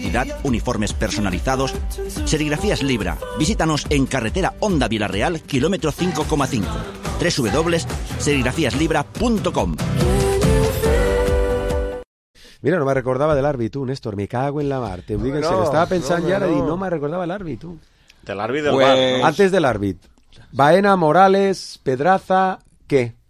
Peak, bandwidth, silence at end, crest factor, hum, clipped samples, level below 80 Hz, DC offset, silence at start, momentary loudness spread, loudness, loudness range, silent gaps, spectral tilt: 0 dBFS; 15.5 kHz; 0.2 s; 18 dB; none; under 0.1%; -30 dBFS; under 0.1%; 0 s; 11 LU; -19 LUFS; 5 LU; 12.05-12.34 s; -5.5 dB/octave